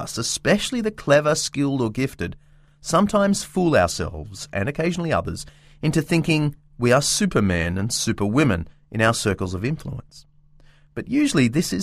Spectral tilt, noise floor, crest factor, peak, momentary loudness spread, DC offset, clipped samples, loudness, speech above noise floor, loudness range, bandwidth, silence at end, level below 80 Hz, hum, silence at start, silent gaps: -5 dB/octave; -51 dBFS; 20 dB; -2 dBFS; 13 LU; under 0.1%; under 0.1%; -21 LUFS; 30 dB; 3 LU; 15.5 kHz; 0 s; -44 dBFS; none; 0 s; none